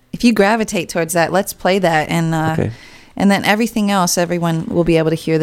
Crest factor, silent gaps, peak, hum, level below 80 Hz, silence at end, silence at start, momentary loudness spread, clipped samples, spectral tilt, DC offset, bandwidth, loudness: 16 dB; none; 0 dBFS; none; -42 dBFS; 0 s; 0.15 s; 5 LU; under 0.1%; -5 dB/octave; under 0.1%; 17 kHz; -16 LUFS